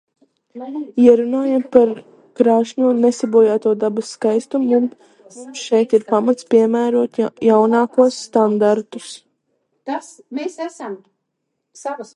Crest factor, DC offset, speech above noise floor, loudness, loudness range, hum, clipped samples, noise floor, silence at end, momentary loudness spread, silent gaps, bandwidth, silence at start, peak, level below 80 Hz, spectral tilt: 16 dB; under 0.1%; 58 dB; -16 LUFS; 7 LU; none; under 0.1%; -75 dBFS; 0.1 s; 17 LU; none; 11 kHz; 0.55 s; 0 dBFS; -68 dBFS; -5.5 dB/octave